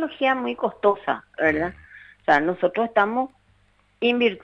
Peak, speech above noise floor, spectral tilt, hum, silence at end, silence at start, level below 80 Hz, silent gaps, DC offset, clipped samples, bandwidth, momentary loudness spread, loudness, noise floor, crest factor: -4 dBFS; 39 dB; -6.5 dB/octave; 50 Hz at -60 dBFS; 0.05 s; 0 s; -56 dBFS; none; under 0.1%; under 0.1%; 7.4 kHz; 8 LU; -23 LUFS; -61 dBFS; 18 dB